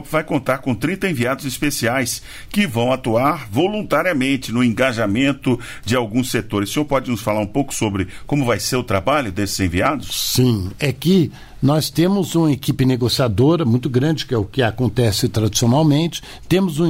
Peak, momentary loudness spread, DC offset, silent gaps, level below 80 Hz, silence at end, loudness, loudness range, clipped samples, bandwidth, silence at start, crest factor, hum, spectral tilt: -4 dBFS; 5 LU; under 0.1%; none; -42 dBFS; 0 s; -18 LUFS; 3 LU; under 0.1%; 16.5 kHz; 0 s; 14 dB; none; -5.5 dB/octave